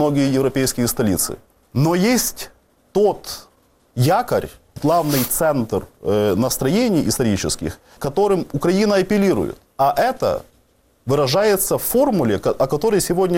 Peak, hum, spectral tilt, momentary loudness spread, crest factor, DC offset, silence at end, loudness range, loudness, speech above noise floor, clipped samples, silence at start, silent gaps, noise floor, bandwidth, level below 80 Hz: -6 dBFS; none; -5 dB/octave; 11 LU; 12 dB; under 0.1%; 0 s; 2 LU; -19 LUFS; 40 dB; under 0.1%; 0 s; none; -58 dBFS; 17 kHz; -44 dBFS